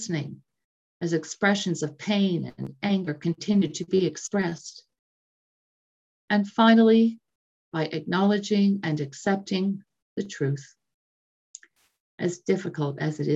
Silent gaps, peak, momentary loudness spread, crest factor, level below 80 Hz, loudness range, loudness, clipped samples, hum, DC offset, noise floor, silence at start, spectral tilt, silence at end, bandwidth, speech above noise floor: 0.64-1.00 s, 4.99-6.28 s, 7.35-7.72 s, 10.02-10.16 s, 10.94-11.54 s, 12.00-12.18 s; -6 dBFS; 14 LU; 20 dB; -70 dBFS; 9 LU; -25 LUFS; under 0.1%; none; under 0.1%; under -90 dBFS; 0 s; -5.5 dB/octave; 0 s; 8 kHz; over 66 dB